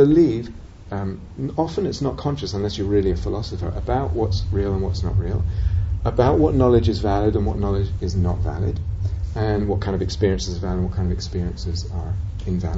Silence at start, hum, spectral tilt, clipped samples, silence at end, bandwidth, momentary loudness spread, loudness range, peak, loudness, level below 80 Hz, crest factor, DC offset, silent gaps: 0 s; none; -7.5 dB/octave; under 0.1%; 0 s; 7.8 kHz; 10 LU; 4 LU; -4 dBFS; -22 LUFS; -28 dBFS; 18 dB; under 0.1%; none